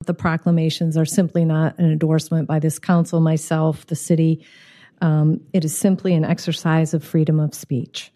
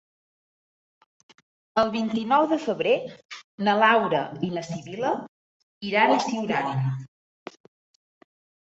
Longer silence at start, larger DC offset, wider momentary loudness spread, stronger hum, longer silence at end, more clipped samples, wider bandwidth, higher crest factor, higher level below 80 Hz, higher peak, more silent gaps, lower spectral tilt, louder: second, 0 s vs 1.75 s; neither; second, 4 LU vs 20 LU; neither; second, 0.1 s vs 1.7 s; neither; first, 13.5 kHz vs 8 kHz; second, 14 dB vs 22 dB; first, -58 dBFS vs -68 dBFS; about the same, -4 dBFS vs -4 dBFS; second, none vs 3.25-3.29 s, 3.44-3.58 s, 5.28-5.81 s; about the same, -6.5 dB/octave vs -5.5 dB/octave; first, -19 LUFS vs -24 LUFS